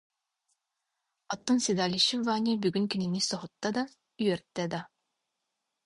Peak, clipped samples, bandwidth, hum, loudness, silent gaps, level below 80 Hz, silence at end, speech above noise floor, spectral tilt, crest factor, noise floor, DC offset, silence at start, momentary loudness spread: -12 dBFS; under 0.1%; 11.5 kHz; none; -30 LUFS; none; -70 dBFS; 1 s; 55 dB; -4 dB/octave; 20 dB; -84 dBFS; under 0.1%; 1.3 s; 10 LU